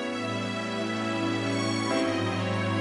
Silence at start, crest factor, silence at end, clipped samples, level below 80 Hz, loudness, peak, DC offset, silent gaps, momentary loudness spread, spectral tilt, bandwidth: 0 s; 14 dB; 0 s; under 0.1%; -66 dBFS; -28 LUFS; -14 dBFS; under 0.1%; none; 4 LU; -5 dB/octave; 11.5 kHz